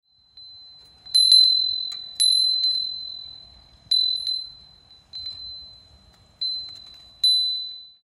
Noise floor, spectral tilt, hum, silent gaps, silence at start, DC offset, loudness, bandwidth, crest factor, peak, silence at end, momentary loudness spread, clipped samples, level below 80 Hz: -54 dBFS; 2.5 dB/octave; none; none; 0.35 s; under 0.1%; -19 LUFS; 14.5 kHz; 20 dB; -4 dBFS; 0.2 s; 23 LU; under 0.1%; -62 dBFS